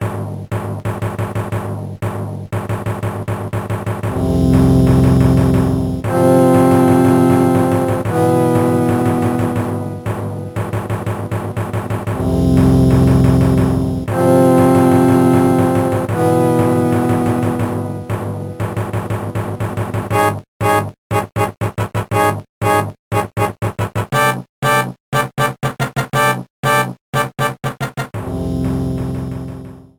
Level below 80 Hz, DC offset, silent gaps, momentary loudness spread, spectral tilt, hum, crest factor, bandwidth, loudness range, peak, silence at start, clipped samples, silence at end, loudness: -32 dBFS; under 0.1%; 20.48-20.60 s, 20.98-21.10 s, 22.49-22.61 s, 22.99-23.11 s, 24.49-24.62 s, 25.00-25.12 s, 26.50-26.63 s, 27.01-27.13 s; 12 LU; -7 dB/octave; none; 14 dB; 19.5 kHz; 8 LU; -2 dBFS; 0 s; under 0.1%; 0.15 s; -16 LUFS